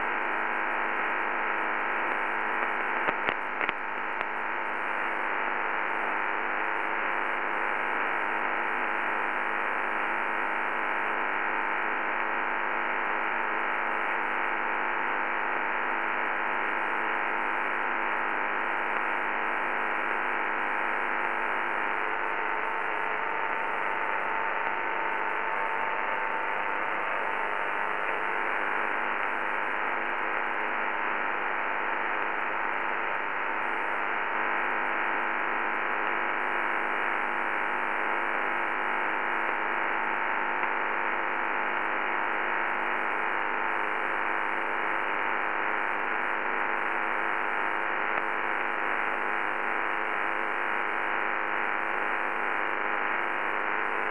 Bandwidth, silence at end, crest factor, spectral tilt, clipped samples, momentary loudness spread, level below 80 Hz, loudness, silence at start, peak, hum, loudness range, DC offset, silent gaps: 11 kHz; 0 s; 22 dB; -4.5 dB/octave; under 0.1%; 1 LU; -68 dBFS; -28 LUFS; 0 s; -8 dBFS; none; 1 LU; 0.9%; none